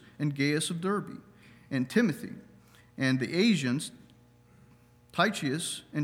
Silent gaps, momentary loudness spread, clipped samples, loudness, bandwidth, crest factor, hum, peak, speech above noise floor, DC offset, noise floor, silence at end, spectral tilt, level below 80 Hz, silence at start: none; 17 LU; under 0.1%; -29 LUFS; 19.5 kHz; 20 dB; 60 Hz at -55 dBFS; -12 dBFS; 30 dB; under 0.1%; -59 dBFS; 0 s; -5 dB/octave; -70 dBFS; 0.2 s